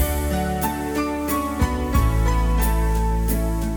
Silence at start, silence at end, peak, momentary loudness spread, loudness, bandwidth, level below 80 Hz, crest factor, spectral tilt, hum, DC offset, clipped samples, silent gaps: 0 s; 0 s; -6 dBFS; 3 LU; -22 LUFS; 19.5 kHz; -22 dBFS; 14 dB; -6 dB/octave; none; under 0.1%; under 0.1%; none